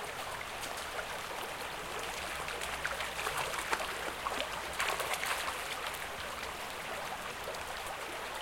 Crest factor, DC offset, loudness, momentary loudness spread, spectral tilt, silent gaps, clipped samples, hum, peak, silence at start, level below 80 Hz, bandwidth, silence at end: 24 dB; under 0.1%; -37 LUFS; 6 LU; -1.5 dB/octave; none; under 0.1%; none; -14 dBFS; 0 s; -58 dBFS; 17 kHz; 0 s